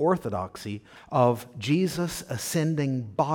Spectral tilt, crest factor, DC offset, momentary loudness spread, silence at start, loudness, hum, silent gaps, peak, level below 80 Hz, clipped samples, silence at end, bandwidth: -6 dB/octave; 20 dB; under 0.1%; 12 LU; 0 s; -27 LUFS; none; none; -8 dBFS; -58 dBFS; under 0.1%; 0 s; 19 kHz